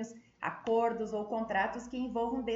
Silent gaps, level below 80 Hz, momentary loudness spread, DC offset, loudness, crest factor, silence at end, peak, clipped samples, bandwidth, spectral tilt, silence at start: none; -62 dBFS; 9 LU; under 0.1%; -34 LUFS; 16 dB; 0 s; -18 dBFS; under 0.1%; 7.8 kHz; -5.5 dB/octave; 0 s